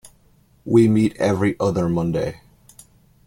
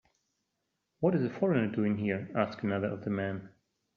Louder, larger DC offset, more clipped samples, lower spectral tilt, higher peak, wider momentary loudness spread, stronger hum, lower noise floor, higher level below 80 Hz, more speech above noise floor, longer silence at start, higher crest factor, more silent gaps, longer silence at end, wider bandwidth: first, -19 LUFS vs -32 LUFS; neither; neither; about the same, -7.5 dB/octave vs -7 dB/octave; first, -4 dBFS vs -12 dBFS; first, 10 LU vs 5 LU; neither; second, -56 dBFS vs -82 dBFS; first, -48 dBFS vs -70 dBFS; second, 38 dB vs 52 dB; second, 0.65 s vs 1 s; about the same, 18 dB vs 20 dB; neither; first, 0.9 s vs 0.5 s; first, 15.5 kHz vs 6.4 kHz